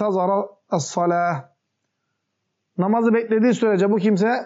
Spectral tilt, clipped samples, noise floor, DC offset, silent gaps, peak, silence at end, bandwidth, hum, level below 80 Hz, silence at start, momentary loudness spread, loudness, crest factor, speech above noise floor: -6.5 dB/octave; under 0.1%; -76 dBFS; under 0.1%; none; -8 dBFS; 0 s; 8 kHz; none; -78 dBFS; 0 s; 8 LU; -20 LUFS; 12 dB; 57 dB